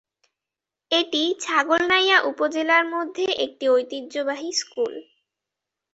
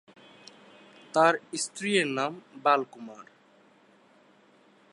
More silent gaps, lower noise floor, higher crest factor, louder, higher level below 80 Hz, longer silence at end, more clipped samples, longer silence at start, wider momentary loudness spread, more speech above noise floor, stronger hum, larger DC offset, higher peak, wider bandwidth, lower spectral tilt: neither; first, -88 dBFS vs -60 dBFS; about the same, 20 dB vs 22 dB; first, -21 LUFS vs -27 LUFS; first, -70 dBFS vs -86 dBFS; second, 0.9 s vs 1.7 s; neither; second, 0.9 s vs 1.15 s; second, 10 LU vs 20 LU; first, 65 dB vs 33 dB; neither; neither; first, -4 dBFS vs -8 dBFS; second, 8.2 kHz vs 11.5 kHz; second, -1 dB/octave vs -3 dB/octave